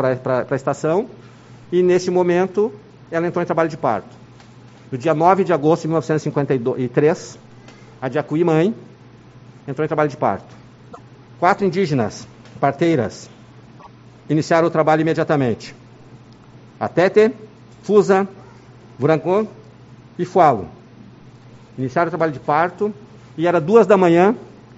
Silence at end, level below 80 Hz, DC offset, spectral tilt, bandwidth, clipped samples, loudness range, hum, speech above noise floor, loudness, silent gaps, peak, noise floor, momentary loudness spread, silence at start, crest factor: 0.3 s; -58 dBFS; under 0.1%; -6.5 dB/octave; 8 kHz; under 0.1%; 3 LU; none; 27 dB; -18 LUFS; none; 0 dBFS; -44 dBFS; 15 LU; 0 s; 20 dB